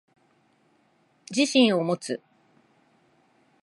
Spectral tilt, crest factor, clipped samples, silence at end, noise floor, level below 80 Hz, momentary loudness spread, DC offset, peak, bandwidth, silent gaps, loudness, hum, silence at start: -4 dB/octave; 20 dB; under 0.1%; 1.45 s; -65 dBFS; -80 dBFS; 14 LU; under 0.1%; -8 dBFS; 11.5 kHz; none; -24 LUFS; none; 1.3 s